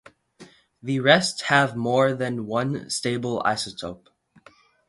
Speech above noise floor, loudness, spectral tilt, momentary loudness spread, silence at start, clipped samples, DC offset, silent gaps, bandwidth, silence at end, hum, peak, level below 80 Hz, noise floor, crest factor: 32 dB; -23 LUFS; -4.5 dB/octave; 12 LU; 0.4 s; under 0.1%; under 0.1%; none; 11.5 kHz; 0.95 s; none; -2 dBFS; -62 dBFS; -55 dBFS; 24 dB